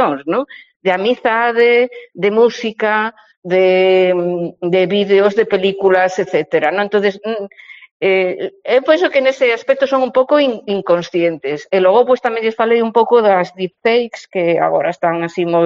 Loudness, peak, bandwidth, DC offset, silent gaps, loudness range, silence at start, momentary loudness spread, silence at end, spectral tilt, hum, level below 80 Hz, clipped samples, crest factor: -14 LUFS; 0 dBFS; 7.4 kHz; under 0.1%; 0.76-0.80 s, 3.37-3.43 s, 7.91-8.00 s; 2 LU; 0 s; 9 LU; 0 s; -3 dB/octave; none; -64 dBFS; under 0.1%; 14 dB